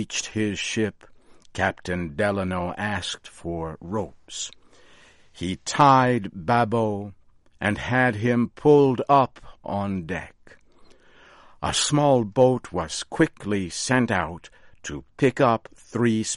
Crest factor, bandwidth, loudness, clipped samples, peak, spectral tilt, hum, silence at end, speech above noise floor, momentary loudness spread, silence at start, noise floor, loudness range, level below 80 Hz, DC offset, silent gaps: 20 dB; 11.5 kHz; -23 LUFS; under 0.1%; -4 dBFS; -5 dB/octave; none; 0 s; 29 dB; 15 LU; 0 s; -52 dBFS; 6 LU; -52 dBFS; under 0.1%; none